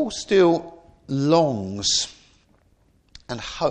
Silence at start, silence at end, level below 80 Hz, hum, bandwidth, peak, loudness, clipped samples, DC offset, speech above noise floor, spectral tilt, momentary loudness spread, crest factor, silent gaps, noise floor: 0 s; 0 s; -52 dBFS; none; 9.6 kHz; -4 dBFS; -21 LUFS; under 0.1%; under 0.1%; 40 dB; -4 dB/octave; 14 LU; 18 dB; none; -60 dBFS